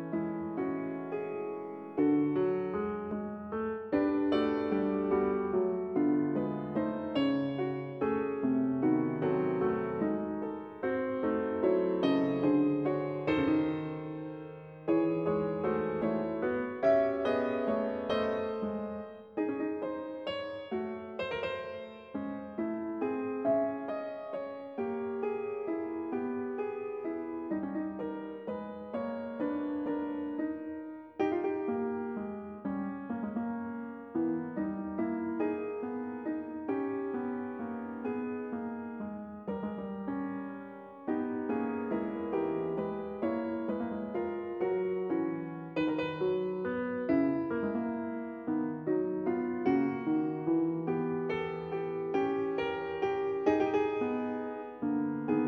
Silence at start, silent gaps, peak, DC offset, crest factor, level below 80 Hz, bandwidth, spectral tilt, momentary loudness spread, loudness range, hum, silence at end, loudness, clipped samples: 0 s; none; -14 dBFS; under 0.1%; 18 dB; -66 dBFS; 6.2 kHz; -8.5 dB/octave; 10 LU; 6 LU; none; 0 s; -33 LUFS; under 0.1%